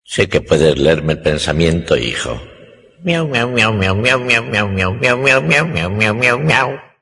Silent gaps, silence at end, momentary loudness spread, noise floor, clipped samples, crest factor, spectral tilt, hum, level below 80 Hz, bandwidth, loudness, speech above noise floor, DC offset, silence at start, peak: none; 0.2 s; 7 LU; -42 dBFS; under 0.1%; 14 dB; -5 dB/octave; none; -38 dBFS; 11 kHz; -14 LUFS; 28 dB; under 0.1%; 0.1 s; 0 dBFS